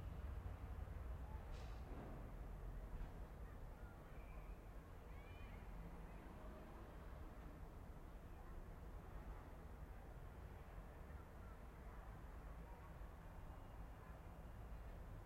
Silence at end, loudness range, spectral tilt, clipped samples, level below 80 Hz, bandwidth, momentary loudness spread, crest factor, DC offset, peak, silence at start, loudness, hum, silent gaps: 0 s; 3 LU; -7 dB/octave; under 0.1%; -56 dBFS; 16 kHz; 5 LU; 14 dB; under 0.1%; -40 dBFS; 0 s; -58 LUFS; none; none